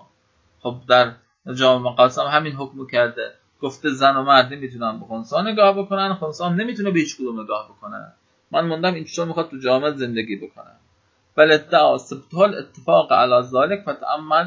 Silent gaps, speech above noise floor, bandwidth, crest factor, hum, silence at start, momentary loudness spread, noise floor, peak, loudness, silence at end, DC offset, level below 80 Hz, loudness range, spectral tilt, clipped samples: none; 43 dB; 7.6 kHz; 20 dB; none; 0.65 s; 16 LU; -62 dBFS; 0 dBFS; -19 LUFS; 0 s; under 0.1%; -66 dBFS; 6 LU; -5 dB/octave; under 0.1%